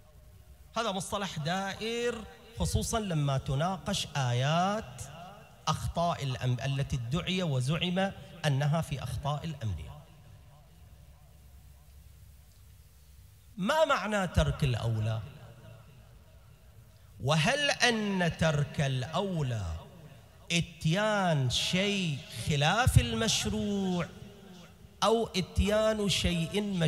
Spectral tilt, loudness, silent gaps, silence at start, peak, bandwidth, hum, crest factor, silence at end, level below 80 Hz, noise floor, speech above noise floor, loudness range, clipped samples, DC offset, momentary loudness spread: -5 dB/octave; -30 LUFS; none; 0.25 s; -8 dBFS; 16 kHz; none; 24 dB; 0 s; -46 dBFS; -56 dBFS; 26 dB; 6 LU; under 0.1%; under 0.1%; 14 LU